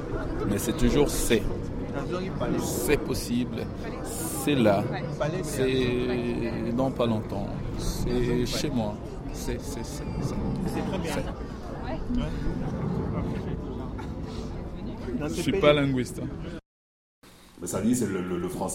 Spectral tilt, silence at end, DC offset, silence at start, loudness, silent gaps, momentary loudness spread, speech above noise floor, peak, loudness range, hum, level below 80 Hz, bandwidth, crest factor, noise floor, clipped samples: -5.5 dB/octave; 0 s; under 0.1%; 0 s; -29 LUFS; 16.66-17.22 s; 12 LU; over 63 dB; -8 dBFS; 5 LU; none; -38 dBFS; 16.5 kHz; 20 dB; under -90 dBFS; under 0.1%